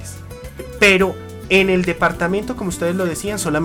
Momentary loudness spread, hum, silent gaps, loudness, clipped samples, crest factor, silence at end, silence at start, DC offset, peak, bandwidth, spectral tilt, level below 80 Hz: 20 LU; none; none; -17 LUFS; under 0.1%; 16 dB; 0 s; 0 s; under 0.1%; -2 dBFS; 17.5 kHz; -4.5 dB/octave; -38 dBFS